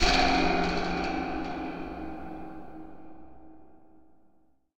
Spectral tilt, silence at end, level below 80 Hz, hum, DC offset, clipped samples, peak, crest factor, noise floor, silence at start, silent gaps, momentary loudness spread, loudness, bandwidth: -4 dB/octave; 0.75 s; -40 dBFS; none; under 0.1%; under 0.1%; -10 dBFS; 20 dB; -65 dBFS; 0 s; none; 23 LU; -29 LUFS; 16 kHz